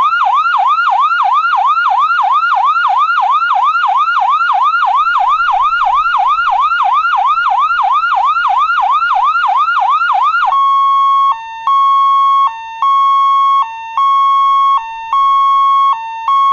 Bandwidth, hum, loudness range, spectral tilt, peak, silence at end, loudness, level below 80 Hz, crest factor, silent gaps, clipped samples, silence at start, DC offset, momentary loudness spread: 7.2 kHz; none; 1 LU; 0.5 dB/octave; -2 dBFS; 0 s; -11 LUFS; -50 dBFS; 8 dB; none; under 0.1%; 0 s; under 0.1%; 3 LU